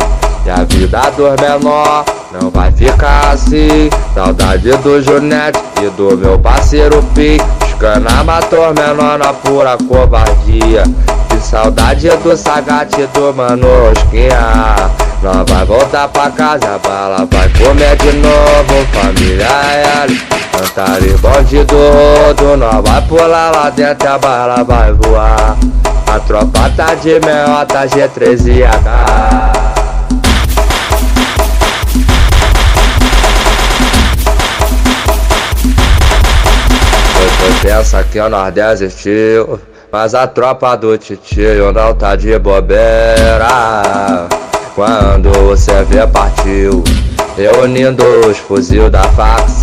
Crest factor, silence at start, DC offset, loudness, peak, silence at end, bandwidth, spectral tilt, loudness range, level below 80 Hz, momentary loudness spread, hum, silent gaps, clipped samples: 8 dB; 0 s; under 0.1%; -9 LUFS; 0 dBFS; 0 s; 15.5 kHz; -5 dB/octave; 2 LU; -12 dBFS; 5 LU; none; none; 4%